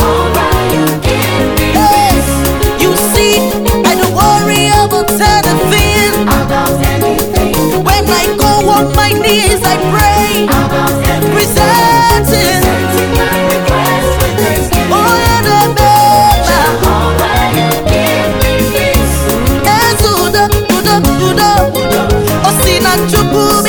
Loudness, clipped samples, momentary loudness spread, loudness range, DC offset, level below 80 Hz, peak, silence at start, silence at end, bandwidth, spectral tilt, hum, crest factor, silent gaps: -9 LUFS; under 0.1%; 4 LU; 1 LU; under 0.1%; -20 dBFS; 0 dBFS; 0 s; 0 s; over 20 kHz; -4.5 dB/octave; none; 8 dB; none